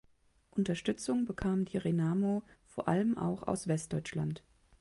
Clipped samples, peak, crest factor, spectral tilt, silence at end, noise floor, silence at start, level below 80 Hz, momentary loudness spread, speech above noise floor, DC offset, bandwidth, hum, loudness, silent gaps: under 0.1%; -16 dBFS; 18 dB; -6.5 dB/octave; 0.4 s; -68 dBFS; 0.55 s; -60 dBFS; 7 LU; 35 dB; under 0.1%; 11.5 kHz; none; -34 LUFS; none